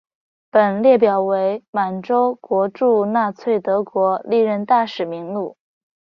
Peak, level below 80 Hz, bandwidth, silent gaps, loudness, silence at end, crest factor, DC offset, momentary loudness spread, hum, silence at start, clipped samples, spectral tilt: -2 dBFS; -66 dBFS; 6.2 kHz; 1.68-1.73 s; -18 LUFS; 0.6 s; 16 dB; under 0.1%; 10 LU; none; 0.55 s; under 0.1%; -8 dB/octave